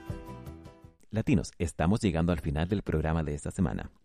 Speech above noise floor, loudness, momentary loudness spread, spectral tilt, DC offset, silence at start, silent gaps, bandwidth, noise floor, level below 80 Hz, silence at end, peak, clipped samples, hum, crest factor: 23 dB; -30 LUFS; 16 LU; -7 dB/octave; under 0.1%; 0 s; none; 13 kHz; -52 dBFS; -42 dBFS; 0.2 s; -12 dBFS; under 0.1%; none; 18 dB